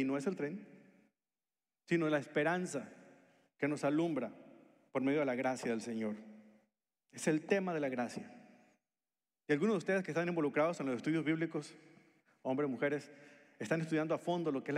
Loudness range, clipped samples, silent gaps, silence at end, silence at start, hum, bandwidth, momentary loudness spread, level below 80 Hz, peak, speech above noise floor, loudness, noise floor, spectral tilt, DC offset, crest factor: 3 LU; under 0.1%; none; 0 s; 0 s; none; 13 kHz; 13 LU; under -90 dBFS; -20 dBFS; over 54 dB; -36 LUFS; under -90 dBFS; -6 dB/octave; under 0.1%; 18 dB